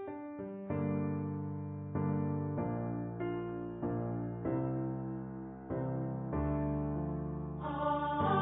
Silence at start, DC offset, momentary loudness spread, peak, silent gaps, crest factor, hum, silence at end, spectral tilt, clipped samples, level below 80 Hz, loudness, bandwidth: 0 s; under 0.1%; 7 LU; -18 dBFS; none; 18 dB; none; 0 s; -6.5 dB/octave; under 0.1%; -52 dBFS; -37 LUFS; 3.8 kHz